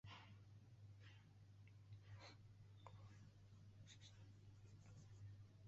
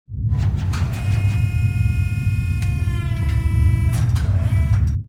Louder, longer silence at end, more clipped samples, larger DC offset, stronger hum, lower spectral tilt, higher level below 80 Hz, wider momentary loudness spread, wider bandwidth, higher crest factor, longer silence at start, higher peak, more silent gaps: second, -65 LUFS vs -20 LUFS; about the same, 0 s vs 0.05 s; neither; second, under 0.1% vs 0.2%; neither; second, -5 dB/octave vs -7 dB/octave; second, -78 dBFS vs -24 dBFS; about the same, 5 LU vs 4 LU; second, 7.6 kHz vs 13.5 kHz; first, 18 dB vs 12 dB; about the same, 0.05 s vs 0.1 s; second, -44 dBFS vs -6 dBFS; neither